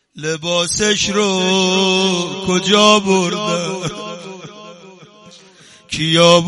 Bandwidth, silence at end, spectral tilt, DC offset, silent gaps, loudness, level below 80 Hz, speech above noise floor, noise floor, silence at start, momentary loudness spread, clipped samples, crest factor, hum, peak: 11.5 kHz; 0 s; -3.5 dB/octave; under 0.1%; none; -15 LUFS; -50 dBFS; 30 dB; -45 dBFS; 0.15 s; 18 LU; under 0.1%; 16 dB; none; 0 dBFS